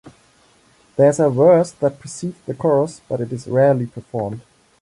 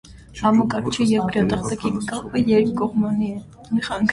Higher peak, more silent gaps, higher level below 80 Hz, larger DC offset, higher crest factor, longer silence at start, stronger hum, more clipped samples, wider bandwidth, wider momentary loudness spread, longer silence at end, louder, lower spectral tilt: about the same, -2 dBFS vs -4 dBFS; neither; second, -58 dBFS vs -46 dBFS; neither; about the same, 16 dB vs 16 dB; about the same, 0.05 s vs 0.05 s; neither; neither; about the same, 11.5 kHz vs 11.5 kHz; first, 15 LU vs 8 LU; first, 0.4 s vs 0 s; first, -18 LUFS vs -21 LUFS; first, -7.5 dB/octave vs -6 dB/octave